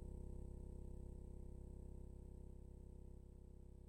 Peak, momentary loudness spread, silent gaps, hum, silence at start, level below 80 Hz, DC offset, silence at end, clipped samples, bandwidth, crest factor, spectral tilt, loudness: -42 dBFS; 6 LU; none; none; 0 s; -56 dBFS; under 0.1%; 0 s; under 0.1%; 10.5 kHz; 12 dB; -9 dB/octave; -58 LUFS